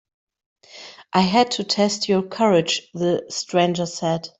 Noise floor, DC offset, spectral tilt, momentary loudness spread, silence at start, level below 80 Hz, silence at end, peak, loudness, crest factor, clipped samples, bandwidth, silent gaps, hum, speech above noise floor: -43 dBFS; under 0.1%; -4.5 dB/octave; 7 LU; 0.75 s; -62 dBFS; 0.1 s; -4 dBFS; -20 LUFS; 18 dB; under 0.1%; 8.2 kHz; none; none; 23 dB